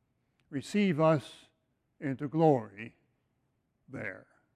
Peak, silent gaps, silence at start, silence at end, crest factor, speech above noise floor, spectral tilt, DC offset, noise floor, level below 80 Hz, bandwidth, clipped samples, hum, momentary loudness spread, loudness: -12 dBFS; none; 0.5 s; 0.35 s; 22 dB; 47 dB; -7.5 dB/octave; under 0.1%; -77 dBFS; -76 dBFS; 12 kHz; under 0.1%; none; 21 LU; -31 LUFS